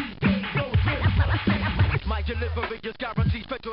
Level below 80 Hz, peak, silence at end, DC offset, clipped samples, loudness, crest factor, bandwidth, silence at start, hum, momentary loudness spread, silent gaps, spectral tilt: -32 dBFS; -10 dBFS; 0 s; under 0.1%; under 0.1%; -25 LUFS; 14 dB; 5.4 kHz; 0 s; none; 7 LU; none; -11 dB/octave